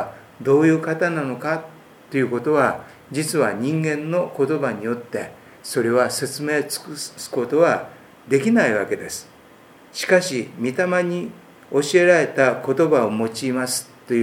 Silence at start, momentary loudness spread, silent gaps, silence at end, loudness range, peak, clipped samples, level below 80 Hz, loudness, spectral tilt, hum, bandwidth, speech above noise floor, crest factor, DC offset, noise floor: 0 s; 13 LU; none; 0 s; 4 LU; -2 dBFS; under 0.1%; -68 dBFS; -21 LUFS; -5 dB/octave; none; 18 kHz; 28 dB; 20 dB; under 0.1%; -48 dBFS